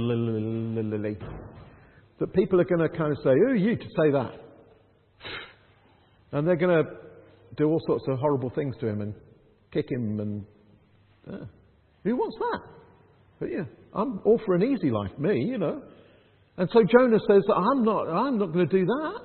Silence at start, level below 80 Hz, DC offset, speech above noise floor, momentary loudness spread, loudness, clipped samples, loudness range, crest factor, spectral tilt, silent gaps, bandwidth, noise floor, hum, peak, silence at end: 0 s; -60 dBFS; under 0.1%; 35 dB; 17 LU; -25 LUFS; under 0.1%; 10 LU; 22 dB; -12 dB/octave; none; 4.4 kHz; -60 dBFS; none; -4 dBFS; 0 s